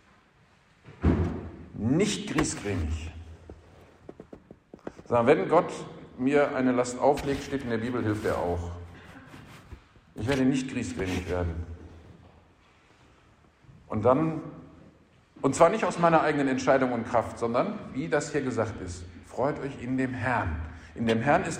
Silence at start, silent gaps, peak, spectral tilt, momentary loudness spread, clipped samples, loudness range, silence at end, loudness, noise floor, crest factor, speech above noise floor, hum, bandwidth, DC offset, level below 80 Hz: 0.85 s; none; -8 dBFS; -6 dB/octave; 22 LU; under 0.1%; 7 LU; 0 s; -27 LUFS; -61 dBFS; 20 dB; 35 dB; none; 15 kHz; under 0.1%; -46 dBFS